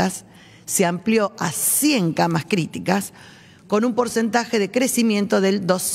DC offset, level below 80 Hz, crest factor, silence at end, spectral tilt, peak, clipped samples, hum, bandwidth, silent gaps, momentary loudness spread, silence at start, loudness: under 0.1%; -62 dBFS; 18 dB; 0 s; -4 dB/octave; -2 dBFS; under 0.1%; none; 16 kHz; none; 6 LU; 0 s; -20 LUFS